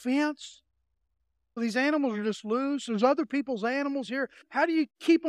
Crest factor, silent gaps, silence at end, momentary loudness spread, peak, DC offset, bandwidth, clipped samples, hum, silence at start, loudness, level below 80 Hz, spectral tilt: 18 dB; none; 0 s; 8 LU; -10 dBFS; under 0.1%; 12 kHz; under 0.1%; none; 0 s; -29 LUFS; -78 dBFS; -5 dB/octave